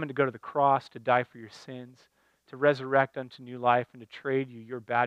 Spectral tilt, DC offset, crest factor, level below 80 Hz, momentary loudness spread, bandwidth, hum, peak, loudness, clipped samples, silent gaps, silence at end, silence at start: -7 dB/octave; under 0.1%; 20 dB; -80 dBFS; 18 LU; 9.4 kHz; none; -8 dBFS; -28 LUFS; under 0.1%; none; 0 s; 0 s